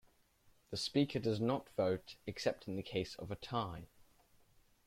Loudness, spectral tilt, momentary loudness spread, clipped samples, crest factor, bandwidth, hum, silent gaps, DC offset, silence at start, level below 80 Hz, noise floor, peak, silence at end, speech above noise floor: -39 LUFS; -6 dB/octave; 11 LU; under 0.1%; 20 dB; 16 kHz; none; none; under 0.1%; 0.7 s; -66 dBFS; -70 dBFS; -20 dBFS; 1 s; 32 dB